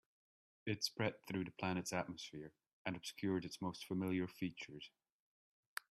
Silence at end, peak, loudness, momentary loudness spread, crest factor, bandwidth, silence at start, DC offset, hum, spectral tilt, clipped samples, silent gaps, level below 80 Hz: 1 s; -24 dBFS; -44 LUFS; 11 LU; 20 dB; 14.5 kHz; 0.65 s; under 0.1%; none; -4.5 dB/octave; under 0.1%; 2.67-2.85 s; -78 dBFS